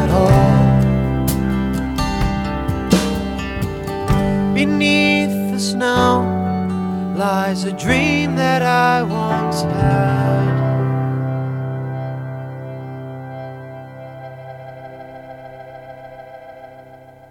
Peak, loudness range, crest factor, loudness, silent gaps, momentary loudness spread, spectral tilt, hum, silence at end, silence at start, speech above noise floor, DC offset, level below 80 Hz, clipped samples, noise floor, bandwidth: 0 dBFS; 17 LU; 18 dB; -17 LUFS; none; 21 LU; -6 dB/octave; none; 0.2 s; 0 s; 25 dB; under 0.1%; -32 dBFS; under 0.1%; -41 dBFS; 18 kHz